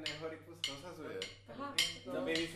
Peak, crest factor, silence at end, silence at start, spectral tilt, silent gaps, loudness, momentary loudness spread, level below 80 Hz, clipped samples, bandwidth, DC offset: -16 dBFS; 26 dB; 0 s; 0 s; -2.5 dB/octave; none; -40 LUFS; 12 LU; -66 dBFS; under 0.1%; 15.5 kHz; under 0.1%